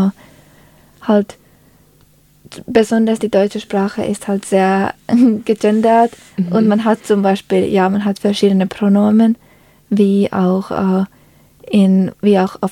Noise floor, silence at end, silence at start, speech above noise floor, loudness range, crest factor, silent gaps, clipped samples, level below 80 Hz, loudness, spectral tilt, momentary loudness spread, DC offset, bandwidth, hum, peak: -50 dBFS; 0 s; 0 s; 37 dB; 4 LU; 14 dB; none; under 0.1%; -54 dBFS; -15 LUFS; -7 dB/octave; 7 LU; under 0.1%; 13 kHz; none; 0 dBFS